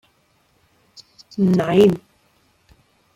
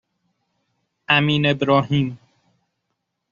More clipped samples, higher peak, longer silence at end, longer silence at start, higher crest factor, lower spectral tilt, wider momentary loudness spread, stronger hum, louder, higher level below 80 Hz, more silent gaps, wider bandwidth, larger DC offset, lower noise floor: neither; about the same, -2 dBFS vs -2 dBFS; about the same, 1.15 s vs 1.15 s; first, 1.4 s vs 1.1 s; about the same, 20 dB vs 22 dB; first, -7.5 dB/octave vs -4 dB/octave; first, 16 LU vs 6 LU; neither; about the same, -17 LUFS vs -18 LUFS; about the same, -58 dBFS vs -58 dBFS; neither; first, 14.5 kHz vs 7 kHz; neither; second, -62 dBFS vs -77 dBFS